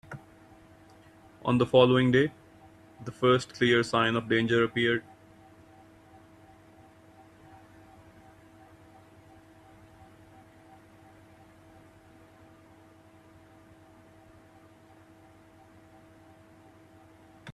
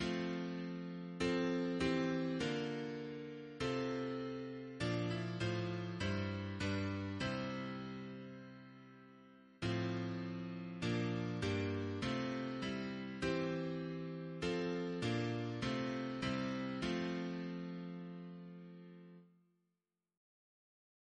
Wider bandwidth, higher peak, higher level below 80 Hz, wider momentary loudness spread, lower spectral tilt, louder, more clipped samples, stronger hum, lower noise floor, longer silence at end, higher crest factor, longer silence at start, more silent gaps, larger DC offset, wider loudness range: first, 12 kHz vs 10 kHz; first, -6 dBFS vs -24 dBFS; about the same, -66 dBFS vs -66 dBFS; first, 23 LU vs 13 LU; about the same, -6 dB/octave vs -6.5 dB/octave; first, -25 LUFS vs -41 LUFS; neither; neither; second, -56 dBFS vs -89 dBFS; second, 0 s vs 1.9 s; first, 26 dB vs 18 dB; about the same, 0.1 s vs 0 s; neither; neither; about the same, 7 LU vs 5 LU